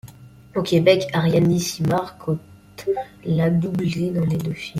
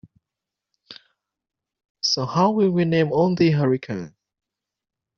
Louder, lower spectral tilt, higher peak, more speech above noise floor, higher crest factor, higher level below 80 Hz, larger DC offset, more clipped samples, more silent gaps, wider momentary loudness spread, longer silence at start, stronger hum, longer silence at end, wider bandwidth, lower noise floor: about the same, -21 LUFS vs -20 LUFS; about the same, -6.5 dB/octave vs -5.5 dB/octave; about the same, -4 dBFS vs -6 dBFS; second, 23 dB vs 66 dB; about the same, 18 dB vs 18 dB; first, -52 dBFS vs -60 dBFS; neither; neither; second, none vs 1.90-1.95 s; about the same, 10 LU vs 12 LU; second, 0.05 s vs 0.9 s; neither; second, 0 s vs 1.1 s; first, 15.5 kHz vs 7 kHz; second, -43 dBFS vs -86 dBFS